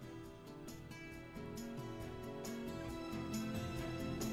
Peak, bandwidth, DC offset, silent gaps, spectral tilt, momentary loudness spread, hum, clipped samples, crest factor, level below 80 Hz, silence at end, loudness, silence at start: -30 dBFS; over 20 kHz; under 0.1%; none; -5.5 dB/octave; 10 LU; none; under 0.1%; 16 dB; -60 dBFS; 0 s; -46 LUFS; 0 s